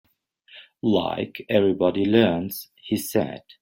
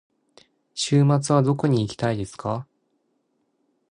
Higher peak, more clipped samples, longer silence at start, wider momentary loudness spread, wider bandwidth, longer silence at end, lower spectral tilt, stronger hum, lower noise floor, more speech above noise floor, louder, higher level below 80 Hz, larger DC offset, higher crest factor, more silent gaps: first, -4 dBFS vs -8 dBFS; neither; second, 0.55 s vs 0.75 s; about the same, 12 LU vs 11 LU; first, 16.5 kHz vs 10.5 kHz; second, 0.2 s vs 1.3 s; about the same, -6 dB/octave vs -6 dB/octave; neither; second, -56 dBFS vs -71 dBFS; second, 33 dB vs 50 dB; about the same, -23 LUFS vs -22 LUFS; about the same, -60 dBFS vs -56 dBFS; neither; about the same, 20 dB vs 16 dB; neither